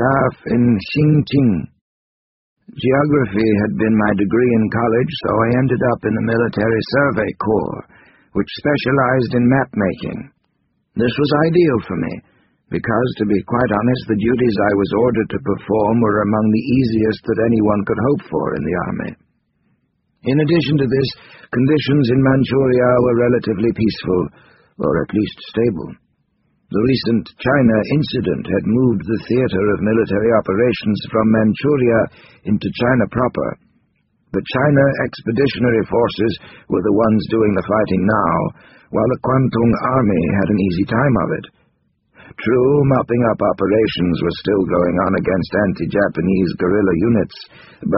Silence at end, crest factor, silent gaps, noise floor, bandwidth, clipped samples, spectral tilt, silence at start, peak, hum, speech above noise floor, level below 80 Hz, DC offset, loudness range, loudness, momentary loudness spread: 0 s; 16 dB; 1.81-2.56 s; -66 dBFS; 5.8 kHz; under 0.1%; -6.5 dB/octave; 0 s; 0 dBFS; none; 50 dB; -44 dBFS; under 0.1%; 3 LU; -17 LUFS; 8 LU